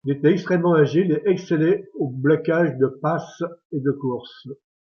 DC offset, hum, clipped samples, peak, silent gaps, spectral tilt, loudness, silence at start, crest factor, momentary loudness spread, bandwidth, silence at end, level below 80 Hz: under 0.1%; none; under 0.1%; -4 dBFS; 3.65-3.70 s; -8.5 dB/octave; -21 LUFS; 0.05 s; 16 dB; 14 LU; 6.8 kHz; 0.4 s; -66 dBFS